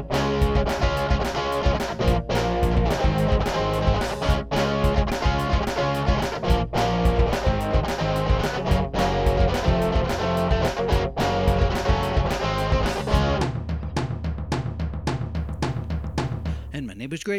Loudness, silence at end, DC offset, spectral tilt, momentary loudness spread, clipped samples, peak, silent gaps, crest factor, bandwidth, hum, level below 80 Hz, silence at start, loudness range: -24 LUFS; 0 s; under 0.1%; -6 dB/octave; 7 LU; under 0.1%; -6 dBFS; none; 16 dB; 15 kHz; none; -28 dBFS; 0 s; 4 LU